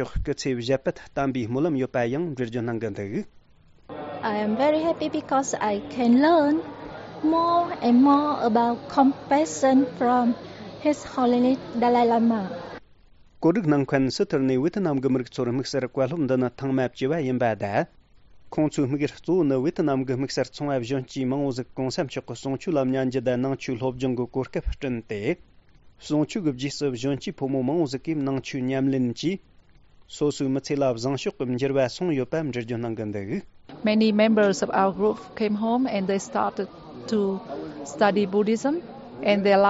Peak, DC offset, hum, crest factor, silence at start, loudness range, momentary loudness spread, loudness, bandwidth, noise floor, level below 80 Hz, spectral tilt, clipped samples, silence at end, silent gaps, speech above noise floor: -6 dBFS; under 0.1%; none; 18 dB; 0 s; 6 LU; 10 LU; -24 LUFS; 8 kHz; -55 dBFS; -48 dBFS; -5.5 dB/octave; under 0.1%; 0 s; none; 31 dB